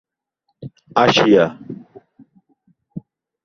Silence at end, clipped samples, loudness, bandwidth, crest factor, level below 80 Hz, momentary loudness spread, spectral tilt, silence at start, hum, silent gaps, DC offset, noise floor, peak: 0.45 s; under 0.1%; -15 LUFS; 7.4 kHz; 20 dB; -58 dBFS; 26 LU; -5 dB/octave; 0.6 s; none; none; under 0.1%; -72 dBFS; 0 dBFS